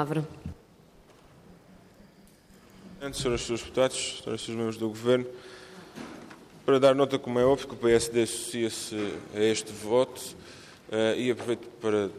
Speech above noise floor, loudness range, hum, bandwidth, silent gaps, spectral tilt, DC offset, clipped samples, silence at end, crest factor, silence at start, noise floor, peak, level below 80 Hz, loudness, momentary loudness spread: 29 dB; 8 LU; none; 15 kHz; none; -4.5 dB/octave; under 0.1%; under 0.1%; 0 s; 22 dB; 0 s; -56 dBFS; -8 dBFS; -56 dBFS; -28 LUFS; 20 LU